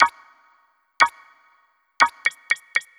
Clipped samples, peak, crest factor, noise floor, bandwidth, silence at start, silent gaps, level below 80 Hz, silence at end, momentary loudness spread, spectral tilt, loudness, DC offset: under 0.1%; -2 dBFS; 22 dB; -63 dBFS; 15 kHz; 0 s; none; -68 dBFS; 0.2 s; 5 LU; 0.5 dB/octave; -21 LUFS; under 0.1%